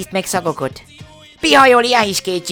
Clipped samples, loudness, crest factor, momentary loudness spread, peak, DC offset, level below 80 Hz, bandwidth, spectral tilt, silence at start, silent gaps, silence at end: 0.3%; -13 LUFS; 16 dB; 14 LU; 0 dBFS; under 0.1%; -48 dBFS; over 20 kHz; -3 dB/octave; 0 s; none; 0 s